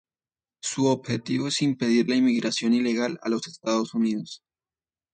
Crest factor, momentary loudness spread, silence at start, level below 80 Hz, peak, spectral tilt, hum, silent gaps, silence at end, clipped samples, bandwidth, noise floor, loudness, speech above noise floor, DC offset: 16 dB; 10 LU; 0.65 s; -70 dBFS; -10 dBFS; -4.5 dB/octave; none; none; 0.75 s; under 0.1%; 9.4 kHz; under -90 dBFS; -25 LUFS; over 66 dB; under 0.1%